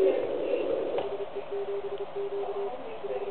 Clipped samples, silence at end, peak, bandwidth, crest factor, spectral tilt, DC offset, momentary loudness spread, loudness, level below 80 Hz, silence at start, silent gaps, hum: under 0.1%; 0 s; -14 dBFS; 4.4 kHz; 18 dB; -9 dB/octave; 0.9%; 7 LU; -33 LUFS; -68 dBFS; 0 s; none; none